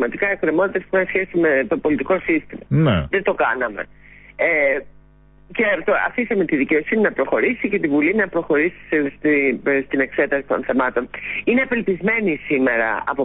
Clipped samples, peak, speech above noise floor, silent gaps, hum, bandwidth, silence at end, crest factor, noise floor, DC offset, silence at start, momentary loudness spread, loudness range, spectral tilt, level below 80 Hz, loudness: under 0.1%; -8 dBFS; 30 dB; none; none; 4 kHz; 0 s; 12 dB; -49 dBFS; under 0.1%; 0 s; 4 LU; 2 LU; -11.5 dB/octave; -46 dBFS; -19 LUFS